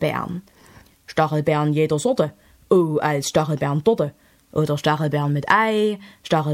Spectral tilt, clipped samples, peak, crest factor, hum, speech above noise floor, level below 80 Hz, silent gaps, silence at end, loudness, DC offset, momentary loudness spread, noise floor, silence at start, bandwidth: -6 dB/octave; under 0.1%; -2 dBFS; 20 dB; none; 30 dB; -56 dBFS; none; 0 s; -21 LUFS; under 0.1%; 10 LU; -50 dBFS; 0 s; 15.5 kHz